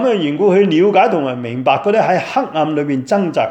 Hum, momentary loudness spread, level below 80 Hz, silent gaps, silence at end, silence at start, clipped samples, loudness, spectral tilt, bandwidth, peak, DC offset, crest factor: none; 7 LU; -64 dBFS; none; 0 s; 0 s; under 0.1%; -14 LUFS; -6.5 dB/octave; 8.6 kHz; 0 dBFS; under 0.1%; 14 dB